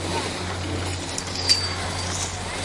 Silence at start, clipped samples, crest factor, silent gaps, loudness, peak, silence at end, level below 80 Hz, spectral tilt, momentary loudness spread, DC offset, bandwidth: 0 s; under 0.1%; 22 dB; none; -24 LUFS; -4 dBFS; 0 s; -46 dBFS; -2.5 dB/octave; 8 LU; under 0.1%; 11.5 kHz